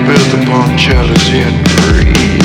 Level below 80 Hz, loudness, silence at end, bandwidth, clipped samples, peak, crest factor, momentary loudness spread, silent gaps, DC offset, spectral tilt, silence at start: -16 dBFS; -8 LUFS; 0 s; 17 kHz; 2%; 0 dBFS; 8 dB; 2 LU; none; under 0.1%; -5 dB/octave; 0 s